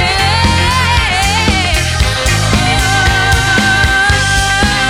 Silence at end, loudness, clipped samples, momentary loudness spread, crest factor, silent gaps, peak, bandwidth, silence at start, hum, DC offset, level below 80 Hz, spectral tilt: 0 s; -10 LUFS; under 0.1%; 3 LU; 10 dB; none; 0 dBFS; 17 kHz; 0 s; none; under 0.1%; -20 dBFS; -3.5 dB/octave